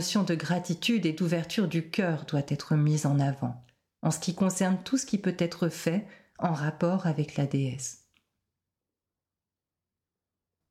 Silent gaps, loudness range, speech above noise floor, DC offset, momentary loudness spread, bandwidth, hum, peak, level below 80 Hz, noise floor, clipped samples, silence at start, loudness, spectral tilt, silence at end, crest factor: none; 7 LU; over 62 dB; under 0.1%; 7 LU; 15 kHz; none; -16 dBFS; -68 dBFS; under -90 dBFS; under 0.1%; 0 s; -29 LUFS; -5.5 dB/octave; 2.75 s; 14 dB